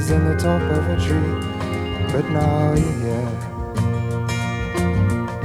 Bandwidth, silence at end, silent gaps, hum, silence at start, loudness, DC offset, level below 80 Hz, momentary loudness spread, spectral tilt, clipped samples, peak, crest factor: 13.5 kHz; 0 s; none; none; 0 s; -21 LUFS; under 0.1%; -32 dBFS; 7 LU; -7 dB/octave; under 0.1%; -6 dBFS; 14 dB